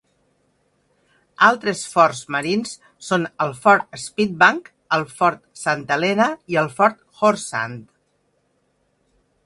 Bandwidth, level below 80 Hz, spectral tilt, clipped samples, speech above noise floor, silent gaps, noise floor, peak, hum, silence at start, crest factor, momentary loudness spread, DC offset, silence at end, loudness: 11.5 kHz; -64 dBFS; -4 dB/octave; under 0.1%; 47 dB; none; -66 dBFS; 0 dBFS; none; 1.4 s; 22 dB; 11 LU; under 0.1%; 1.6 s; -19 LUFS